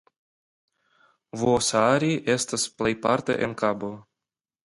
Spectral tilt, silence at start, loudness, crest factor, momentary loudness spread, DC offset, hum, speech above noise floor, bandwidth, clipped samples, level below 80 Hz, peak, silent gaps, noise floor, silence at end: -4 dB/octave; 1.35 s; -24 LUFS; 20 dB; 12 LU; under 0.1%; none; 66 dB; 11.5 kHz; under 0.1%; -58 dBFS; -6 dBFS; none; -90 dBFS; 0.65 s